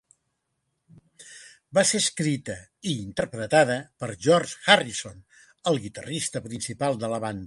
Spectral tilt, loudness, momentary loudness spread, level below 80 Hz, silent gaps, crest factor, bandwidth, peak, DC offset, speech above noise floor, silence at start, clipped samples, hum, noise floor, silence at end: -3.5 dB/octave; -25 LUFS; 15 LU; -60 dBFS; none; 26 dB; 11.5 kHz; 0 dBFS; under 0.1%; 52 dB; 1.2 s; under 0.1%; none; -77 dBFS; 0 s